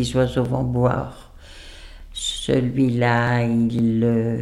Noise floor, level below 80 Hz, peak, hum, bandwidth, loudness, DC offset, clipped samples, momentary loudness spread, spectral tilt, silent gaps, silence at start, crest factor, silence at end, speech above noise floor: -41 dBFS; -40 dBFS; -6 dBFS; none; 12 kHz; -20 LUFS; under 0.1%; under 0.1%; 16 LU; -6 dB/octave; none; 0 s; 16 dB; 0 s; 21 dB